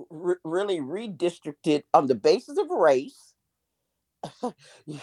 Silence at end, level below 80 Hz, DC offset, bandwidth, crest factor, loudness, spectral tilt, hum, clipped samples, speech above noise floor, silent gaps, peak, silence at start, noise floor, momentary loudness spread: 0 s; -78 dBFS; under 0.1%; 11.5 kHz; 22 dB; -25 LUFS; -5.5 dB/octave; none; under 0.1%; 55 dB; none; -6 dBFS; 0 s; -80 dBFS; 16 LU